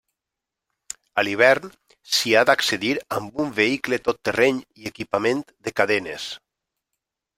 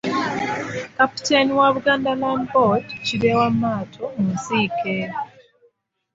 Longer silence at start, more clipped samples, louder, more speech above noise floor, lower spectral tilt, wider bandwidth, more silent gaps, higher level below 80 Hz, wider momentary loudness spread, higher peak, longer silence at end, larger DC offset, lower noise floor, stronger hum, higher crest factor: first, 1.15 s vs 0.05 s; neither; about the same, -21 LUFS vs -20 LUFS; first, 64 dB vs 42 dB; second, -3 dB/octave vs -5 dB/octave; first, 16 kHz vs 8 kHz; neither; second, -62 dBFS vs -56 dBFS; first, 16 LU vs 10 LU; about the same, -2 dBFS vs -2 dBFS; about the same, 1 s vs 0.9 s; neither; first, -86 dBFS vs -62 dBFS; neither; about the same, 22 dB vs 18 dB